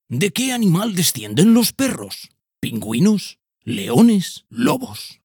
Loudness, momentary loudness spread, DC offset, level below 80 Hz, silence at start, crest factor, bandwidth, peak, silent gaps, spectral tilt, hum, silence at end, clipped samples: -18 LUFS; 16 LU; under 0.1%; -60 dBFS; 0.1 s; 18 dB; over 20 kHz; -2 dBFS; none; -5 dB/octave; none; 0.15 s; under 0.1%